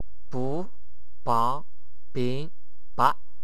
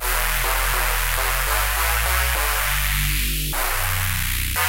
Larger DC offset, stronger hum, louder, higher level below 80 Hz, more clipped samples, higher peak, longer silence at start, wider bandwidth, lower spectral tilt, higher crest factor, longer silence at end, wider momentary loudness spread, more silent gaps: first, 7% vs 0.8%; neither; second, -29 LUFS vs -20 LUFS; second, -58 dBFS vs -26 dBFS; neither; about the same, -4 dBFS vs -4 dBFS; first, 0.3 s vs 0 s; second, 13.5 kHz vs 17.5 kHz; first, -6.5 dB/octave vs -2 dB/octave; first, 24 dB vs 16 dB; first, 0.3 s vs 0 s; first, 14 LU vs 2 LU; neither